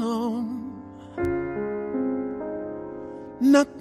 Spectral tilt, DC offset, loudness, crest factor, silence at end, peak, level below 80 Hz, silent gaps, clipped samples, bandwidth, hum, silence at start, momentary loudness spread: -5.5 dB/octave; under 0.1%; -26 LUFS; 18 dB; 0 s; -8 dBFS; -52 dBFS; none; under 0.1%; 12.5 kHz; none; 0 s; 19 LU